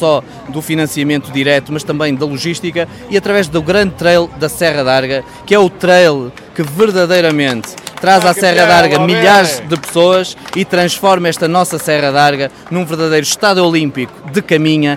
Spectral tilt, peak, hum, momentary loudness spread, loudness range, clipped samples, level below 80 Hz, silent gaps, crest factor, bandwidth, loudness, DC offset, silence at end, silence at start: -4.5 dB/octave; 0 dBFS; none; 11 LU; 4 LU; under 0.1%; -46 dBFS; none; 12 dB; 16.5 kHz; -12 LUFS; under 0.1%; 0 s; 0 s